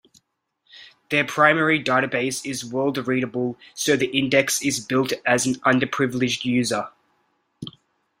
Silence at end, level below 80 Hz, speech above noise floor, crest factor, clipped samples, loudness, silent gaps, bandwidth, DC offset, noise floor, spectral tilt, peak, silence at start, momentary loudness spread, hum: 0.5 s; -62 dBFS; 50 dB; 22 dB; under 0.1%; -21 LUFS; none; 16 kHz; under 0.1%; -72 dBFS; -3.5 dB/octave; -2 dBFS; 0.75 s; 10 LU; none